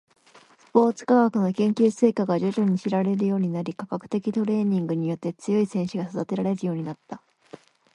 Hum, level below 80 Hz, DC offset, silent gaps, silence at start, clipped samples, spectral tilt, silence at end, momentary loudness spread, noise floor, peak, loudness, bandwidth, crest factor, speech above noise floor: none; -70 dBFS; under 0.1%; none; 0.75 s; under 0.1%; -8 dB/octave; 0.4 s; 11 LU; -54 dBFS; -4 dBFS; -24 LUFS; 10.5 kHz; 20 dB; 31 dB